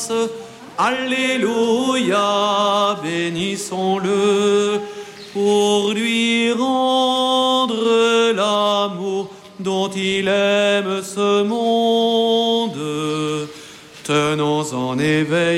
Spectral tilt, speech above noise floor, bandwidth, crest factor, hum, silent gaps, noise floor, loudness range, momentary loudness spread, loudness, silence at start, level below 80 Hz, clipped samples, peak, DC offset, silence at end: -4 dB/octave; 22 dB; 15.5 kHz; 12 dB; none; none; -39 dBFS; 3 LU; 9 LU; -18 LUFS; 0 s; -62 dBFS; under 0.1%; -6 dBFS; under 0.1%; 0 s